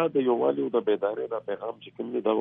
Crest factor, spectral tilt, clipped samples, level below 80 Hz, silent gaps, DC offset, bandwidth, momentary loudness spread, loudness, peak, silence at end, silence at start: 16 dB; -10 dB/octave; under 0.1%; -76 dBFS; none; under 0.1%; 3.8 kHz; 10 LU; -28 LUFS; -12 dBFS; 0 s; 0 s